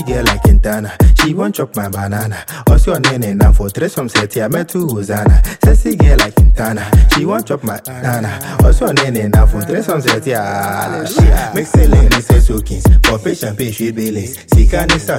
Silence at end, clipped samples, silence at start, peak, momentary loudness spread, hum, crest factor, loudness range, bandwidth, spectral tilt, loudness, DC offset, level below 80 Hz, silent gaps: 0 s; under 0.1%; 0 s; 0 dBFS; 9 LU; none; 10 dB; 2 LU; 16.5 kHz; -5.5 dB/octave; -13 LUFS; under 0.1%; -12 dBFS; none